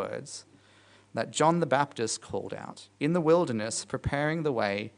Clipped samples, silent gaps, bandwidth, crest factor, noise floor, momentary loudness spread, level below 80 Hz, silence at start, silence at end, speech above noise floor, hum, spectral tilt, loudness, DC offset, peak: under 0.1%; none; 10.5 kHz; 20 dB; -59 dBFS; 15 LU; -58 dBFS; 0 s; 0.1 s; 30 dB; none; -5 dB/octave; -29 LUFS; under 0.1%; -10 dBFS